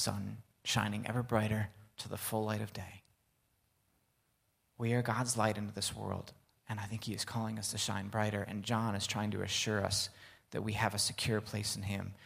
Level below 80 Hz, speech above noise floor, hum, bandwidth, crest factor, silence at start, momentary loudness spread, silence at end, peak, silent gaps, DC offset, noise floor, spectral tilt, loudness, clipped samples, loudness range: -64 dBFS; 41 dB; none; 16 kHz; 24 dB; 0 s; 11 LU; 0 s; -14 dBFS; none; under 0.1%; -77 dBFS; -4 dB/octave; -36 LUFS; under 0.1%; 5 LU